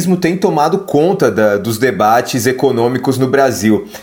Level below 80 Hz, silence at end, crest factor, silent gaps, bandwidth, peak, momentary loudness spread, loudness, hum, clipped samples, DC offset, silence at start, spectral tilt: -52 dBFS; 0 s; 12 dB; none; 19 kHz; 0 dBFS; 3 LU; -13 LUFS; none; under 0.1%; under 0.1%; 0 s; -5.5 dB/octave